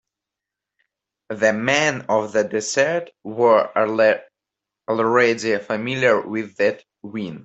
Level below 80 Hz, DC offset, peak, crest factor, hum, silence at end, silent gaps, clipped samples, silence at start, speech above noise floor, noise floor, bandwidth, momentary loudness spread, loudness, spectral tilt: -66 dBFS; under 0.1%; -2 dBFS; 18 dB; none; 0 s; none; under 0.1%; 1.3 s; 66 dB; -86 dBFS; 8.2 kHz; 14 LU; -19 LUFS; -4 dB/octave